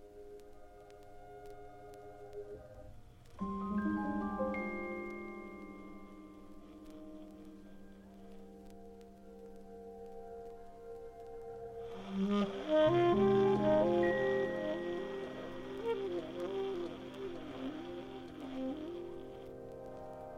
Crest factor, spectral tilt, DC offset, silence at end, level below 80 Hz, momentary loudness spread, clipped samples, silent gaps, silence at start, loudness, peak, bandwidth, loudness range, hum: 18 dB; -7.5 dB/octave; under 0.1%; 0 s; -60 dBFS; 25 LU; under 0.1%; none; 0 s; -36 LUFS; -20 dBFS; 12.5 kHz; 22 LU; none